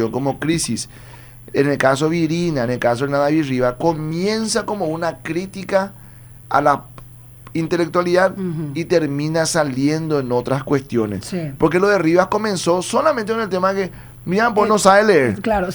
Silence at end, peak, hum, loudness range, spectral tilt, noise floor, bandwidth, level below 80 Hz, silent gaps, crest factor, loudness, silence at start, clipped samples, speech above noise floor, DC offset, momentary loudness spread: 0 s; 0 dBFS; none; 4 LU; -5 dB/octave; -40 dBFS; over 20 kHz; -46 dBFS; none; 18 dB; -18 LUFS; 0 s; under 0.1%; 22 dB; under 0.1%; 9 LU